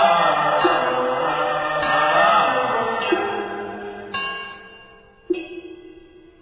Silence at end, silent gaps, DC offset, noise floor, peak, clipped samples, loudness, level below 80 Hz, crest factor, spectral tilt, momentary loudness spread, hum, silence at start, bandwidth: 0.4 s; none; under 0.1%; -47 dBFS; -4 dBFS; under 0.1%; -20 LUFS; -56 dBFS; 18 dB; -7.5 dB/octave; 17 LU; none; 0 s; 4 kHz